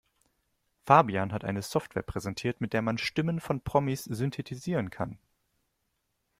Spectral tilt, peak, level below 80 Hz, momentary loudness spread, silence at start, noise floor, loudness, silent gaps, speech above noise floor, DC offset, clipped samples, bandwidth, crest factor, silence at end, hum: -6 dB/octave; -4 dBFS; -56 dBFS; 13 LU; 0.85 s; -79 dBFS; -30 LUFS; none; 49 dB; under 0.1%; under 0.1%; 16 kHz; 26 dB; 1.25 s; none